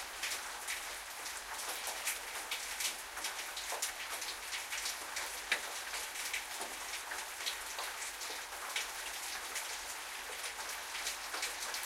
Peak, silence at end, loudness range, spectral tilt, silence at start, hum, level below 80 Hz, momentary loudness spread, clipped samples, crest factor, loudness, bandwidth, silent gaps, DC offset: -18 dBFS; 0 s; 1 LU; 1.5 dB/octave; 0 s; none; -68 dBFS; 4 LU; under 0.1%; 24 dB; -39 LUFS; 16.5 kHz; none; under 0.1%